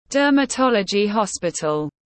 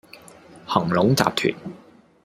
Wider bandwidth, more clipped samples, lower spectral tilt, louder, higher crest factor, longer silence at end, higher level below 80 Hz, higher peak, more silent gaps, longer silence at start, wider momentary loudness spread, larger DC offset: second, 8.8 kHz vs 16 kHz; neither; about the same, -4 dB/octave vs -5 dB/octave; about the same, -20 LUFS vs -21 LUFS; second, 14 dB vs 22 dB; second, 0.2 s vs 0.5 s; about the same, -58 dBFS vs -56 dBFS; second, -6 dBFS vs -2 dBFS; neither; about the same, 0.1 s vs 0.15 s; second, 6 LU vs 20 LU; neither